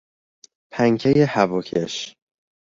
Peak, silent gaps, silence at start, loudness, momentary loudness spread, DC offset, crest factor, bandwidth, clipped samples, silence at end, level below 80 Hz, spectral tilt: -2 dBFS; none; 0.75 s; -20 LUFS; 15 LU; under 0.1%; 20 dB; 7.6 kHz; under 0.1%; 0.5 s; -58 dBFS; -6 dB/octave